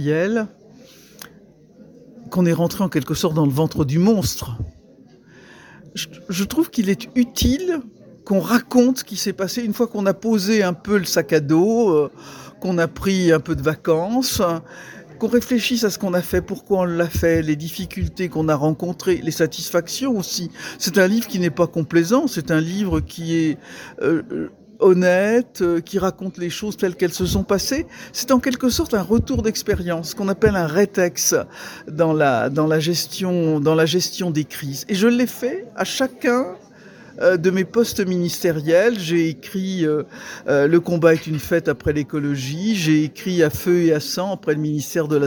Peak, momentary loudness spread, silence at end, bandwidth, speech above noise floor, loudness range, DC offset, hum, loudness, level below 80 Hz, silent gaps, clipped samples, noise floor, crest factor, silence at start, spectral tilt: -2 dBFS; 10 LU; 0 s; 19.5 kHz; 29 dB; 3 LU; under 0.1%; none; -20 LUFS; -42 dBFS; none; under 0.1%; -48 dBFS; 18 dB; 0 s; -5 dB/octave